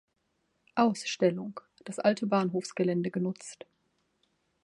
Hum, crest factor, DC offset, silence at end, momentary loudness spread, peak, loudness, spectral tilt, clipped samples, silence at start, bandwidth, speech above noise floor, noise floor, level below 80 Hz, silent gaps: none; 20 dB; under 0.1%; 1.1 s; 15 LU; -12 dBFS; -30 LUFS; -5.5 dB/octave; under 0.1%; 0.75 s; 11.5 kHz; 47 dB; -77 dBFS; -78 dBFS; none